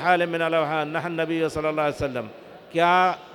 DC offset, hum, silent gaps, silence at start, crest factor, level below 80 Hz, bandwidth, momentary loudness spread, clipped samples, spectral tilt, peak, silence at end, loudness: under 0.1%; none; none; 0 s; 18 dB; -54 dBFS; 18.5 kHz; 10 LU; under 0.1%; -5.5 dB/octave; -6 dBFS; 0 s; -23 LUFS